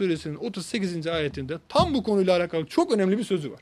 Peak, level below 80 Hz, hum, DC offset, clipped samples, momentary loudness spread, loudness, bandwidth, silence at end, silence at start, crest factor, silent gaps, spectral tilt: -6 dBFS; -52 dBFS; none; under 0.1%; under 0.1%; 8 LU; -25 LUFS; 13 kHz; 0.05 s; 0 s; 20 dB; none; -6 dB/octave